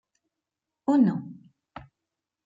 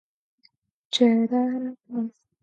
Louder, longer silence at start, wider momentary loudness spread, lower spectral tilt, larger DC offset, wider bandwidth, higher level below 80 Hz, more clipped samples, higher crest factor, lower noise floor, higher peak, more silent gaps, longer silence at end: about the same, -25 LUFS vs -24 LUFS; about the same, 0.9 s vs 0.9 s; first, 25 LU vs 12 LU; first, -9 dB/octave vs -5 dB/octave; neither; second, 7.6 kHz vs 8.8 kHz; first, -68 dBFS vs -80 dBFS; neither; about the same, 20 dB vs 20 dB; first, -87 dBFS vs -65 dBFS; second, -10 dBFS vs -6 dBFS; neither; first, 1.1 s vs 0.35 s